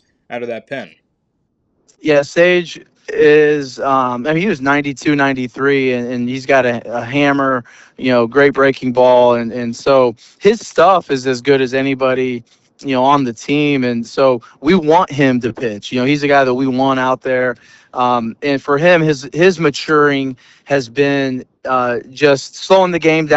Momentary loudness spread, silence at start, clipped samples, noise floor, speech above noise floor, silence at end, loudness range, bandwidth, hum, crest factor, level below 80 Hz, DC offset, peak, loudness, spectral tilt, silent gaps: 10 LU; 0.3 s; under 0.1%; -66 dBFS; 52 dB; 0 s; 2 LU; 8.2 kHz; none; 14 dB; -52 dBFS; under 0.1%; 0 dBFS; -14 LUFS; -5.5 dB/octave; none